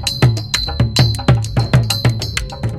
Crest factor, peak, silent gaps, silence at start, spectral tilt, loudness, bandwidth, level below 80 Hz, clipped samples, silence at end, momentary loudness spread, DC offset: 14 dB; 0 dBFS; none; 0 s; -5 dB/octave; -16 LUFS; 15 kHz; -28 dBFS; under 0.1%; 0 s; 6 LU; under 0.1%